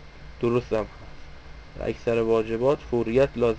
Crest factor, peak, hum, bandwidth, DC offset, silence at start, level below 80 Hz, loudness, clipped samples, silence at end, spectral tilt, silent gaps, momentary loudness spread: 16 dB; -10 dBFS; none; 8 kHz; under 0.1%; 0 s; -44 dBFS; -25 LUFS; under 0.1%; 0 s; -7.5 dB/octave; none; 22 LU